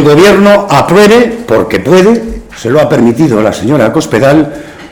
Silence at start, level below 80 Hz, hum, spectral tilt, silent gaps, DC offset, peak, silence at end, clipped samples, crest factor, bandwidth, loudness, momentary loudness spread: 0 s; -32 dBFS; none; -6 dB/octave; none; 0.3%; 0 dBFS; 0.05 s; 3%; 6 dB; 19.5 kHz; -7 LUFS; 8 LU